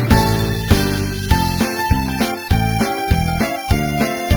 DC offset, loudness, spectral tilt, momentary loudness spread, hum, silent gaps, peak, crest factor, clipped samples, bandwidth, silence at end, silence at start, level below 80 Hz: under 0.1%; -18 LUFS; -5.5 dB/octave; 3 LU; none; none; 0 dBFS; 16 dB; under 0.1%; over 20 kHz; 0 s; 0 s; -24 dBFS